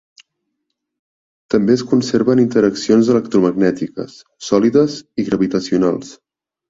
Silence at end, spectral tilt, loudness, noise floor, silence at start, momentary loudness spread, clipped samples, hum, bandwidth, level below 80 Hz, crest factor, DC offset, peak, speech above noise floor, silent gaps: 0.55 s; -6.5 dB/octave; -16 LUFS; -75 dBFS; 1.5 s; 12 LU; under 0.1%; none; 7.8 kHz; -54 dBFS; 16 dB; under 0.1%; -2 dBFS; 60 dB; none